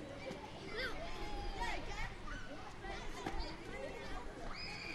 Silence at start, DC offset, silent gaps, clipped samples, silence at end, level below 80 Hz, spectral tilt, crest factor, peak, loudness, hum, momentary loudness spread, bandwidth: 0 s; under 0.1%; none; under 0.1%; 0 s; -48 dBFS; -4 dB/octave; 18 dB; -26 dBFS; -46 LUFS; none; 6 LU; 12.5 kHz